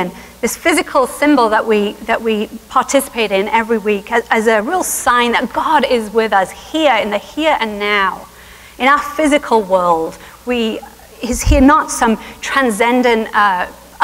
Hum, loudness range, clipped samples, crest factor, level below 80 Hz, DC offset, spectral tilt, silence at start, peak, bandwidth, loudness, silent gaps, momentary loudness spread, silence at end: 60 Hz at -50 dBFS; 1 LU; under 0.1%; 14 dB; -30 dBFS; under 0.1%; -4 dB/octave; 0 s; 0 dBFS; 16 kHz; -14 LUFS; none; 8 LU; 0 s